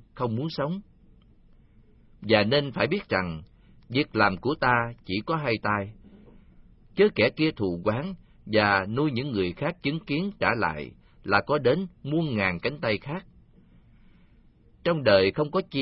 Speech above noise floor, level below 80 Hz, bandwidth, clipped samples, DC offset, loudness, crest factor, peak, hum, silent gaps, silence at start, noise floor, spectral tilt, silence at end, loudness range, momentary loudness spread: 31 dB; -54 dBFS; 5.8 kHz; under 0.1%; under 0.1%; -26 LUFS; 22 dB; -6 dBFS; none; none; 0.15 s; -57 dBFS; -10.5 dB/octave; 0 s; 3 LU; 13 LU